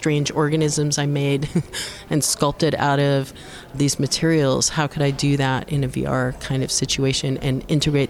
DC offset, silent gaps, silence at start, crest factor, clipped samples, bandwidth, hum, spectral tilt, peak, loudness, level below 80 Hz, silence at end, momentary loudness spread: under 0.1%; none; 0 s; 16 dB; under 0.1%; 15 kHz; none; -4.5 dB/octave; -4 dBFS; -21 LUFS; -42 dBFS; 0 s; 6 LU